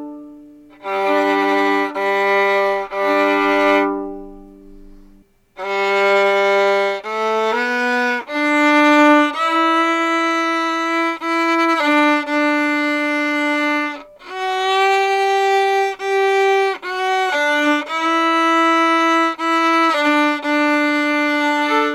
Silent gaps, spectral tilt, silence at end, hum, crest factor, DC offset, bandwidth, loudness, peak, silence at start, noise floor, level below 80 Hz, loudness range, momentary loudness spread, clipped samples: none; -3 dB/octave; 0 s; none; 14 dB; under 0.1%; 15.5 kHz; -16 LUFS; -2 dBFS; 0 s; -49 dBFS; -54 dBFS; 4 LU; 6 LU; under 0.1%